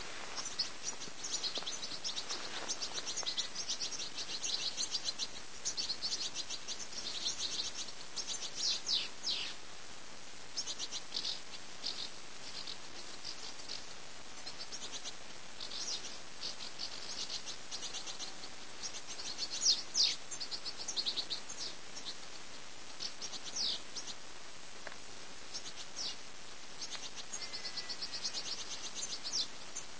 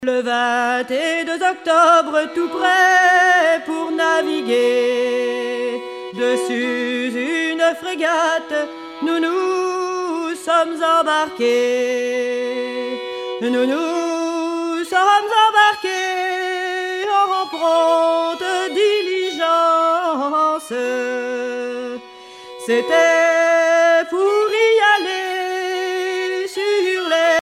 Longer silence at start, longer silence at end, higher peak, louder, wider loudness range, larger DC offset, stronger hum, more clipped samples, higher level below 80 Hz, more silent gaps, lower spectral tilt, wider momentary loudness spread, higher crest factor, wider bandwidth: about the same, 0 s vs 0 s; about the same, 0 s vs 0 s; second, -18 dBFS vs -2 dBFS; second, -39 LUFS vs -17 LUFS; first, 9 LU vs 5 LU; first, 0.7% vs under 0.1%; neither; neither; about the same, -70 dBFS vs -70 dBFS; neither; second, 0.5 dB/octave vs -2 dB/octave; first, 13 LU vs 10 LU; first, 22 dB vs 16 dB; second, 8 kHz vs 14.5 kHz